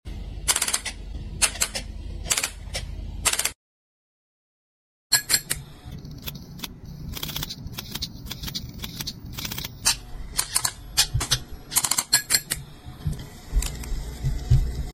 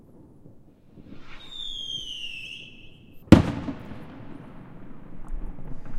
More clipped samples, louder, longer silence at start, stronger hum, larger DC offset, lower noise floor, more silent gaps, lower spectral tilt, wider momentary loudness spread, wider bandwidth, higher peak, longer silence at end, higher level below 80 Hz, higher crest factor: neither; about the same, -25 LUFS vs -24 LUFS; about the same, 0.05 s vs 0.15 s; neither; neither; first, under -90 dBFS vs -50 dBFS; first, 3.55-5.10 s vs none; second, -1.5 dB/octave vs -6.5 dB/octave; second, 16 LU vs 28 LU; first, 17 kHz vs 15 kHz; about the same, -2 dBFS vs 0 dBFS; about the same, 0 s vs 0 s; first, -34 dBFS vs -40 dBFS; about the same, 26 dB vs 28 dB